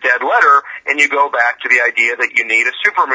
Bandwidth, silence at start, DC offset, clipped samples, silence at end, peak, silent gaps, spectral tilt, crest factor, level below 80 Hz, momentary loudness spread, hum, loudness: 8 kHz; 0 s; under 0.1%; under 0.1%; 0 s; 0 dBFS; none; -0.5 dB/octave; 14 dB; -66 dBFS; 4 LU; none; -12 LUFS